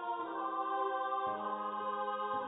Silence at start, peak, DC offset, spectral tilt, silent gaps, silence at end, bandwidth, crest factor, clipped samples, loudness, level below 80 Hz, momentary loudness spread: 0 s; -24 dBFS; under 0.1%; 1.5 dB/octave; none; 0 s; 3.9 kHz; 14 dB; under 0.1%; -37 LUFS; -82 dBFS; 3 LU